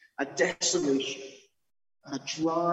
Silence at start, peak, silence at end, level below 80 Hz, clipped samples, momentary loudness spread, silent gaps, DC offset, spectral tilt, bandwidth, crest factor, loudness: 0.2 s; -12 dBFS; 0 s; -72 dBFS; under 0.1%; 15 LU; none; under 0.1%; -3 dB/octave; 8.6 kHz; 18 dB; -29 LUFS